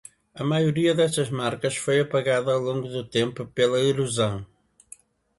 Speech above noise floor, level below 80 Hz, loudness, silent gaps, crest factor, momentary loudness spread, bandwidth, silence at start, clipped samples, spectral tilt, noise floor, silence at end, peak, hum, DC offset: 28 dB; -60 dBFS; -24 LUFS; none; 18 dB; 7 LU; 11.5 kHz; 0.35 s; under 0.1%; -5 dB/octave; -51 dBFS; 0.95 s; -8 dBFS; none; under 0.1%